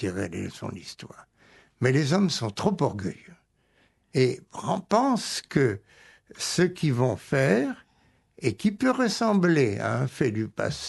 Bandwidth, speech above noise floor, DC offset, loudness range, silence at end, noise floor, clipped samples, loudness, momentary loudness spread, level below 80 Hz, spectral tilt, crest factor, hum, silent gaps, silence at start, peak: 12 kHz; 40 dB; under 0.1%; 3 LU; 0 s; -66 dBFS; under 0.1%; -26 LUFS; 14 LU; -60 dBFS; -5.5 dB/octave; 20 dB; none; none; 0 s; -6 dBFS